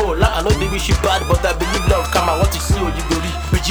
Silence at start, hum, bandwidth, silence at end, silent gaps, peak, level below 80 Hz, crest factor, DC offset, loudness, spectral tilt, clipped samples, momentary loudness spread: 0 s; none; over 20 kHz; 0 s; none; 0 dBFS; -22 dBFS; 16 dB; under 0.1%; -17 LUFS; -4.5 dB/octave; under 0.1%; 4 LU